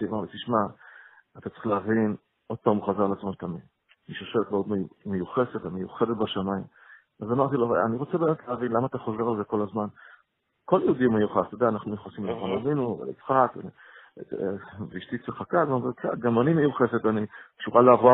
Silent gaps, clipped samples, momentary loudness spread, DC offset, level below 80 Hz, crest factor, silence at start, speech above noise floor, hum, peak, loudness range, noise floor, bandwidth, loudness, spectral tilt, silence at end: none; under 0.1%; 14 LU; under 0.1%; -64 dBFS; 22 dB; 0 s; 44 dB; none; -4 dBFS; 3 LU; -70 dBFS; 4 kHz; -26 LUFS; -11 dB/octave; 0 s